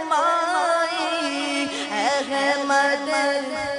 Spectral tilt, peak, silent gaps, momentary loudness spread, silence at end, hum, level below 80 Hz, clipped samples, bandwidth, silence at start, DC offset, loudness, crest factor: -1.5 dB/octave; -8 dBFS; none; 4 LU; 0 s; none; -64 dBFS; under 0.1%; 11 kHz; 0 s; under 0.1%; -22 LUFS; 14 dB